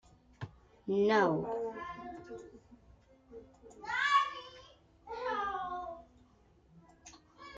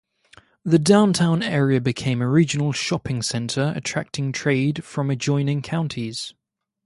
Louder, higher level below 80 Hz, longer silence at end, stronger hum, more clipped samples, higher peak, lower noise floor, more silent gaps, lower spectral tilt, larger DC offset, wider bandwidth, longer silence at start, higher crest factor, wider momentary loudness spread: second, -33 LUFS vs -21 LUFS; second, -66 dBFS vs -56 dBFS; second, 0 s vs 0.55 s; neither; neither; second, -16 dBFS vs -2 dBFS; first, -65 dBFS vs -54 dBFS; neither; about the same, -5 dB/octave vs -5.5 dB/octave; neither; second, 9 kHz vs 11.5 kHz; second, 0.4 s vs 0.65 s; about the same, 20 dB vs 18 dB; first, 27 LU vs 10 LU